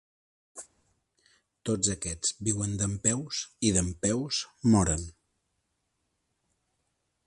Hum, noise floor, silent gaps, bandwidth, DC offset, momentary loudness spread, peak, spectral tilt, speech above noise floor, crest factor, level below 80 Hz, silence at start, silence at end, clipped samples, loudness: none; -79 dBFS; none; 11.5 kHz; under 0.1%; 20 LU; -10 dBFS; -4 dB/octave; 50 dB; 22 dB; -48 dBFS; 0.55 s; 2.15 s; under 0.1%; -28 LUFS